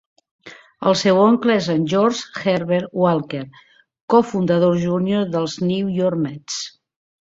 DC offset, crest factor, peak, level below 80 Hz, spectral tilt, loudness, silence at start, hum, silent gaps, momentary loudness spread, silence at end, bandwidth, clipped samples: under 0.1%; 16 dB; -2 dBFS; -60 dBFS; -6 dB/octave; -19 LUFS; 0.45 s; none; 4.01-4.08 s; 12 LU; 0.65 s; 7.8 kHz; under 0.1%